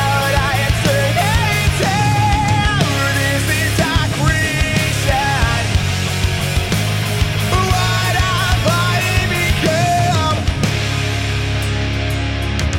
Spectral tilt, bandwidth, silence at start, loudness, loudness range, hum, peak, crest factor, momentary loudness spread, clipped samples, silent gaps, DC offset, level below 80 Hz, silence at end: -4.5 dB/octave; 16.5 kHz; 0 s; -16 LUFS; 2 LU; none; -4 dBFS; 12 dB; 4 LU; under 0.1%; none; under 0.1%; -26 dBFS; 0 s